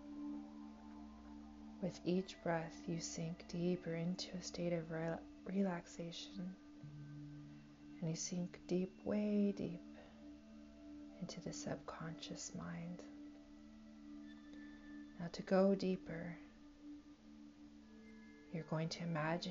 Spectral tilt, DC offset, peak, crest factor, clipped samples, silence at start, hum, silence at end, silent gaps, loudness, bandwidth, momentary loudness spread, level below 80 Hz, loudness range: -6 dB/octave; under 0.1%; -24 dBFS; 22 dB; under 0.1%; 0 s; none; 0 s; none; -43 LUFS; 7.4 kHz; 19 LU; -70 dBFS; 7 LU